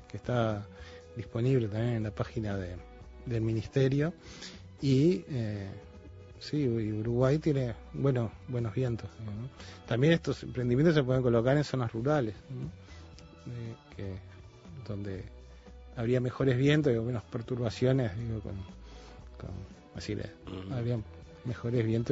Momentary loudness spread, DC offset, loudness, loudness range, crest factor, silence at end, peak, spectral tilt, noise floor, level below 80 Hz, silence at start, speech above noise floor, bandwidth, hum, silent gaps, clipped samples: 21 LU; under 0.1%; -31 LUFS; 9 LU; 20 dB; 0 s; -10 dBFS; -7.5 dB/octave; -50 dBFS; -52 dBFS; 0 s; 20 dB; 7.8 kHz; none; none; under 0.1%